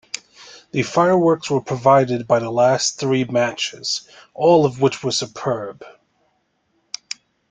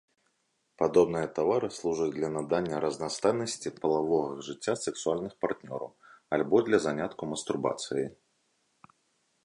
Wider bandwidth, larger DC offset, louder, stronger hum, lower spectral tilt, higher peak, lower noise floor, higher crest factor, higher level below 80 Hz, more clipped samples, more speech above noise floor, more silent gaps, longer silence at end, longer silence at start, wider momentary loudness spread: second, 9.6 kHz vs 11 kHz; neither; first, -18 LUFS vs -30 LUFS; neither; about the same, -4.5 dB/octave vs -5 dB/octave; first, -2 dBFS vs -10 dBFS; second, -67 dBFS vs -76 dBFS; about the same, 18 dB vs 20 dB; first, -60 dBFS vs -66 dBFS; neither; about the same, 48 dB vs 47 dB; neither; first, 1.6 s vs 1.3 s; second, 0.15 s vs 0.8 s; first, 17 LU vs 10 LU